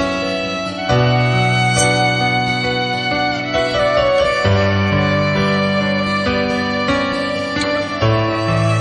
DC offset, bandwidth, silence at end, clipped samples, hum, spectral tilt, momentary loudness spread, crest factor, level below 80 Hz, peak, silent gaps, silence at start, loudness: under 0.1%; 11.5 kHz; 0 s; under 0.1%; none; -5 dB/octave; 5 LU; 14 dB; -40 dBFS; -2 dBFS; none; 0 s; -16 LUFS